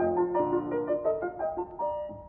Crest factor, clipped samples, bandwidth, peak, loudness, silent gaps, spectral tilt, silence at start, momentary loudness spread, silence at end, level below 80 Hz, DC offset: 14 dB; under 0.1%; 3.2 kHz; -16 dBFS; -30 LUFS; none; -7.5 dB/octave; 0 s; 6 LU; 0 s; -58 dBFS; under 0.1%